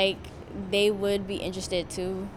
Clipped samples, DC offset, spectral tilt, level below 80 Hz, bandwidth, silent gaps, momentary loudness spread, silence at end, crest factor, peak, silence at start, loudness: under 0.1%; under 0.1%; -4 dB/octave; -50 dBFS; 14 kHz; none; 14 LU; 0 s; 18 dB; -10 dBFS; 0 s; -28 LUFS